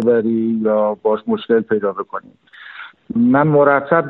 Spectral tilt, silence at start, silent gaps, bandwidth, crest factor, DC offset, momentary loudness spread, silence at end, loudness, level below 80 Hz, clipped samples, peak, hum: -6.5 dB/octave; 0 s; none; 4.2 kHz; 16 dB; under 0.1%; 20 LU; 0 s; -16 LUFS; -60 dBFS; under 0.1%; 0 dBFS; none